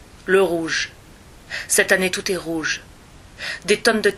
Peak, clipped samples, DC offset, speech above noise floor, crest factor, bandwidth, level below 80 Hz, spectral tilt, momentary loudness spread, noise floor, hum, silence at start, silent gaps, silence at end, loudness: -2 dBFS; under 0.1%; under 0.1%; 25 dB; 20 dB; 15 kHz; -50 dBFS; -2.5 dB/octave; 13 LU; -45 dBFS; none; 0.15 s; none; 0 s; -20 LUFS